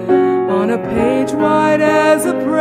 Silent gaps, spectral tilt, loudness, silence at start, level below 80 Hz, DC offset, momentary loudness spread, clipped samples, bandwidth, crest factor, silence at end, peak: none; -5.5 dB/octave; -14 LUFS; 0 s; -44 dBFS; under 0.1%; 4 LU; under 0.1%; 16 kHz; 12 dB; 0 s; -2 dBFS